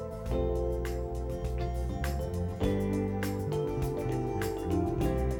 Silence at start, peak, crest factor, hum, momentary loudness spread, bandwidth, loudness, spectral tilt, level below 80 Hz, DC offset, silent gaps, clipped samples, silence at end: 0 s; -16 dBFS; 16 dB; none; 4 LU; 19 kHz; -33 LUFS; -7.5 dB/octave; -38 dBFS; under 0.1%; none; under 0.1%; 0 s